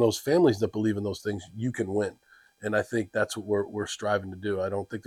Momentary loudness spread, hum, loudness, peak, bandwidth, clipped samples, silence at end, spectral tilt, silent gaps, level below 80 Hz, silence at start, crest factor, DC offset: 10 LU; none; -28 LUFS; -10 dBFS; 15.5 kHz; under 0.1%; 0.05 s; -5.5 dB/octave; none; -66 dBFS; 0 s; 18 dB; under 0.1%